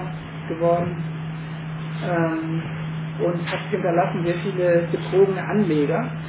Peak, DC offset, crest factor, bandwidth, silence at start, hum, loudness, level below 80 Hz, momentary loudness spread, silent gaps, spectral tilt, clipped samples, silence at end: -6 dBFS; under 0.1%; 16 dB; 4 kHz; 0 s; none; -23 LUFS; -52 dBFS; 11 LU; none; -11.5 dB/octave; under 0.1%; 0 s